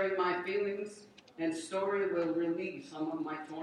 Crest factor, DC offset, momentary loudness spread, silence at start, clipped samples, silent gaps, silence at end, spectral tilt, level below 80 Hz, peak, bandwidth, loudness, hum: 14 dB; under 0.1%; 9 LU; 0 s; under 0.1%; none; 0 s; -5 dB/octave; -80 dBFS; -20 dBFS; 11 kHz; -35 LUFS; none